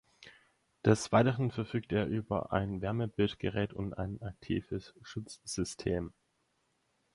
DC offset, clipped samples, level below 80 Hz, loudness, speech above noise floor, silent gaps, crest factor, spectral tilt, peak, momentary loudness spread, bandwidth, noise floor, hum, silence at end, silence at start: under 0.1%; under 0.1%; -54 dBFS; -34 LUFS; 44 dB; none; 24 dB; -6 dB/octave; -10 dBFS; 15 LU; 11.5 kHz; -77 dBFS; none; 1.05 s; 0.2 s